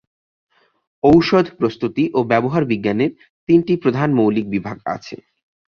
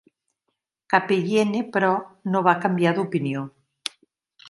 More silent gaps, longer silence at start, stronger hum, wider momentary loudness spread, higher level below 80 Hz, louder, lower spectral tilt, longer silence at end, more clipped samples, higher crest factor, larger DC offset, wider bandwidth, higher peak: first, 3.30-3.47 s vs none; first, 1.05 s vs 0.9 s; neither; about the same, 13 LU vs 13 LU; first, -50 dBFS vs -72 dBFS; first, -17 LUFS vs -22 LUFS; first, -8 dB/octave vs -6 dB/octave; first, 0.65 s vs 0 s; neither; second, 16 dB vs 22 dB; neither; second, 6.8 kHz vs 11.5 kHz; about the same, -2 dBFS vs -2 dBFS